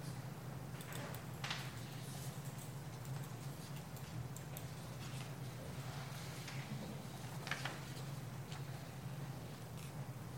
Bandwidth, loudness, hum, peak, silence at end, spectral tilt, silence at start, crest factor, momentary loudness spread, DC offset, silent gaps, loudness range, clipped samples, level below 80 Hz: 16.5 kHz; -48 LUFS; none; -24 dBFS; 0 s; -5 dB/octave; 0 s; 22 dB; 5 LU; under 0.1%; none; 1 LU; under 0.1%; -66 dBFS